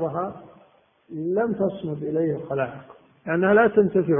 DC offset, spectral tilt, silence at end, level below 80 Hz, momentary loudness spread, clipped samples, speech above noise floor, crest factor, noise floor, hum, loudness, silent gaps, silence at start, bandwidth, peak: under 0.1%; -12 dB/octave; 0 s; -60 dBFS; 20 LU; under 0.1%; 35 dB; 18 dB; -58 dBFS; none; -23 LUFS; none; 0 s; 3.7 kHz; -6 dBFS